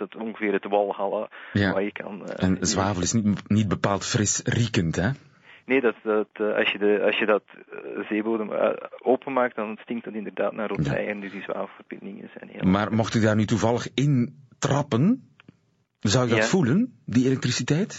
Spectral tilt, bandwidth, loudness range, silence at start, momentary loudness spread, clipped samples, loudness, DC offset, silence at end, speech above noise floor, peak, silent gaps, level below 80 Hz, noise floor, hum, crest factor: -5.5 dB/octave; 8 kHz; 4 LU; 0 s; 11 LU; under 0.1%; -24 LUFS; under 0.1%; 0 s; 43 dB; -8 dBFS; none; -58 dBFS; -67 dBFS; none; 16 dB